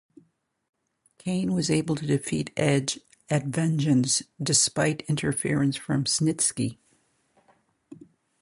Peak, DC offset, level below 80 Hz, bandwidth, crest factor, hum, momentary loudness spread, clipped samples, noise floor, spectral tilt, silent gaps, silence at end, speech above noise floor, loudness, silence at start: -8 dBFS; under 0.1%; -60 dBFS; 11.5 kHz; 20 dB; none; 8 LU; under 0.1%; -68 dBFS; -4 dB/octave; none; 1.7 s; 43 dB; -25 LUFS; 1.25 s